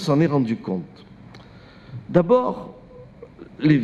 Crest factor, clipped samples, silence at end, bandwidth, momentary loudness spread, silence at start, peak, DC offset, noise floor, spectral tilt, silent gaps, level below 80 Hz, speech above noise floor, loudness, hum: 18 dB; under 0.1%; 0 s; 10 kHz; 25 LU; 0 s; -4 dBFS; under 0.1%; -45 dBFS; -8 dB/octave; none; -54 dBFS; 25 dB; -21 LUFS; none